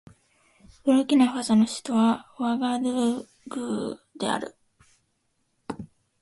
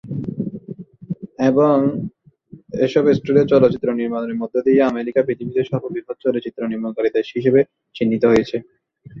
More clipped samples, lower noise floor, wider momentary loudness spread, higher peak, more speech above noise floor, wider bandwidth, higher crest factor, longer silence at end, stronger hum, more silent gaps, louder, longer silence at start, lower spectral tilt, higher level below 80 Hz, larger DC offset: neither; first, -73 dBFS vs -45 dBFS; first, 18 LU vs 14 LU; second, -8 dBFS vs -2 dBFS; first, 49 dB vs 27 dB; first, 11.5 kHz vs 7.2 kHz; about the same, 18 dB vs 18 dB; first, 0.35 s vs 0 s; neither; neither; second, -25 LUFS vs -19 LUFS; first, 0.85 s vs 0.05 s; second, -5 dB/octave vs -8 dB/octave; second, -64 dBFS vs -54 dBFS; neither